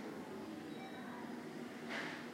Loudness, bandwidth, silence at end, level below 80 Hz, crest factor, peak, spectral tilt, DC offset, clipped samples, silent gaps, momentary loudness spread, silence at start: -47 LUFS; 16 kHz; 0 s; -82 dBFS; 16 dB; -32 dBFS; -4.5 dB/octave; under 0.1%; under 0.1%; none; 5 LU; 0 s